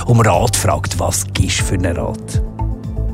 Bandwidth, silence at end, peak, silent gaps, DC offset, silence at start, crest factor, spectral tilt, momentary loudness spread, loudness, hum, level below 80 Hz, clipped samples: 16 kHz; 0 s; -2 dBFS; none; under 0.1%; 0 s; 14 dB; -4.5 dB/octave; 10 LU; -17 LUFS; none; -26 dBFS; under 0.1%